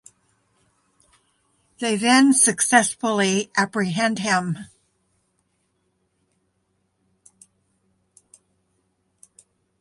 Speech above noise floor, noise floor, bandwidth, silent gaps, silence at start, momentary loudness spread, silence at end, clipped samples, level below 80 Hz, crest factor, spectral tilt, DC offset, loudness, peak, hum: 51 dB; -71 dBFS; 11.5 kHz; none; 1.8 s; 10 LU; 5.15 s; under 0.1%; -70 dBFS; 22 dB; -3 dB/octave; under 0.1%; -19 LUFS; -2 dBFS; none